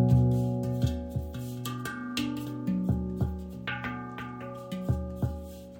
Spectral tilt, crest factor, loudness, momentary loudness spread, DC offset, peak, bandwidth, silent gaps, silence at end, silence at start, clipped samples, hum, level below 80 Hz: -7 dB/octave; 20 dB; -32 LUFS; 10 LU; under 0.1%; -10 dBFS; 17 kHz; none; 0 s; 0 s; under 0.1%; none; -42 dBFS